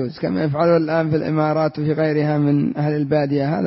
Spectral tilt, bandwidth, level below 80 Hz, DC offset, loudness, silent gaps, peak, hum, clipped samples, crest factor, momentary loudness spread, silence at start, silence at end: -12 dB/octave; 5.8 kHz; -56 dBFS; under 0.1%; -19 LUFS; none; -6 dBFS; none; under 0.1%; 12 dB; 4 LU; 0 s; 0 s